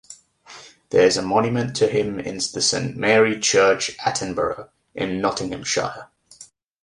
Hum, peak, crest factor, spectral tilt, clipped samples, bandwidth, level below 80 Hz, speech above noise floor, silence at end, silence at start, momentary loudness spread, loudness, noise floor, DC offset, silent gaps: none; -2 dBFS; 18 dB; -3.5 dB/octave; under 0.1%; 11.5 kHz; -54 dBFS; 28 dB; 0.4 s; 0.1 s; 10 LU; -20 LUFS; -48 dBFS; under 0.1%; none